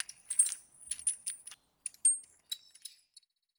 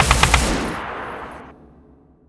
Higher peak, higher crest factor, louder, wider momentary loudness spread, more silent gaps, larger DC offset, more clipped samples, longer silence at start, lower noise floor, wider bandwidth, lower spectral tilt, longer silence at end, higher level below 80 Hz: second, -10 dBFS vs 0 dBFS; about the same, 26 dB vs 22 dB; second, -32 LUFS vs -19 LUFS; about the same, 22 LU vs 21 LU; neither; neither; neither; about the same, 0 s vs 0 s; first, -65 dBFS vs -50 dBFS; first, over 20 kHz vs 11 kHz; second, 4.5 dB/octave vs -3.5 dB/octave; about the same, 0.7 s vs 0.75 s; second, -82 dBFS vs -28 dBFS